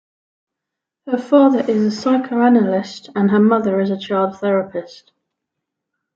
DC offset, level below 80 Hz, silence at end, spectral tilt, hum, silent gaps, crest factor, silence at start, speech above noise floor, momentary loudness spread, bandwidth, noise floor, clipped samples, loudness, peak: under 0.1%; -66 dBFS; 1.3 s; -7.5 dB/octave; none; none; 16 dB; 1.05 s; 67 dB; 11 LU; 7.4 kHz; -83 dBFS; under 0.1%; -16 LUFS; -2 dBFS